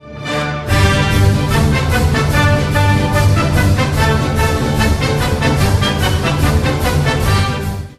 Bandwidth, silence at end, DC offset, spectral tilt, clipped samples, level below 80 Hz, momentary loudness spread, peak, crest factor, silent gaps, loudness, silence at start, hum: 14 kHz; 0.05 s; under 0.1%; -5.5 dB/octave; under 0.1%; -22 dBFS; 3 LU; 0 dBFS; 12 dB; none; -14 LUFS; 0.05 s; none